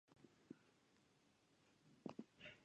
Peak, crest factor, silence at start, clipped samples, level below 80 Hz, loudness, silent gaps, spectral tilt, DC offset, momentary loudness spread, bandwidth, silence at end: -38 dBFS; 26 dB; 0.1 s; under 0.1%; under -90 dBFS; -60 LUFS; none; -5.5 dB/octave; under 0.1%; 8 LU; 9 kHz; 0 s